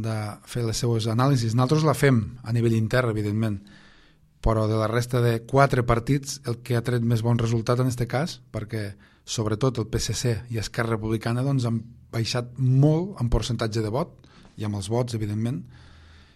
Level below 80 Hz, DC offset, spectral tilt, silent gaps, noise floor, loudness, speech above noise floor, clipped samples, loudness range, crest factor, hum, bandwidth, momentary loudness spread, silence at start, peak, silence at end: -40 dBFS; under 0.1%; -6 dB/octave; none; -56 dBFS; -25 LUFS; 32 dB; under 0.1%; 4 LU; 20 dB; none; 14 kHz; 11 LU; 0 s; -4 dBFS; 0.6 s